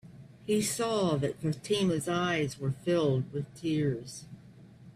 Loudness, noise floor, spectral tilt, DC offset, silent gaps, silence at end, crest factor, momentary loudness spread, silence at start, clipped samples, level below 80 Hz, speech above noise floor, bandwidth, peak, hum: -30 LUFS; -53 dBFS; -5.5 dB/octave; under 0.1%; none; 0.05 s; 14 dB; 10 LU; 0.05 s; under 0.1%; -62 dBFS; 23 dB; 15 kHz; -18 dBFS; none